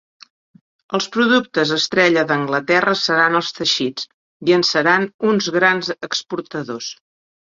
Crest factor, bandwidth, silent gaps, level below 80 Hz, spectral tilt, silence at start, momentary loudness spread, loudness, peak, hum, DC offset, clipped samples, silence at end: 18 dB; 7.6 kHz; 4.14-4.40 s, 5.14-5.19 s; -64 dBFS; -3.5 dB/octave; 0.9 s; 12 LU; -17 LUFS; 0 dBFS; none; under 0.1%; under 0.1%; 0.6 s